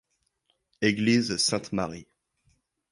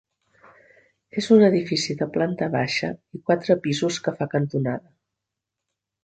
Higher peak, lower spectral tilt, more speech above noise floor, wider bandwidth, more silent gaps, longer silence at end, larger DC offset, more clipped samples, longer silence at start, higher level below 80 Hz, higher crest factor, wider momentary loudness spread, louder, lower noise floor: second, -8 dBFS vs -4 dBFS; second, -4 dB/octave vs -5.5 dB/octave; second, 49 dB vs 62 dB; first, 11.5 kHz vs 9 kHz; neither; second, 0.9 s vs 1.25 s; neither; neither; second, 0.8 s vs 1.15 s; about the same, -60 dBFS vs -64 dBFS; about the same, 20 dB vs 20 dB; second, 11 LU vs 14 LU; second, -26 LUFS vs -22 LUFS; second, -74 dBFS vs -84 dBFS